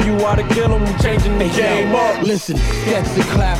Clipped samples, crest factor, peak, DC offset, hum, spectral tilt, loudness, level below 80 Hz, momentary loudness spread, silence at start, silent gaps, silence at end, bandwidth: under 0.1%; 12 dB; -2 dBFS; under 0.1%; none; -5.5 dB/octave; -16 LUFS; -22 dBFS; 3 LU; 0 s; none; 0 s; 15.5 kHz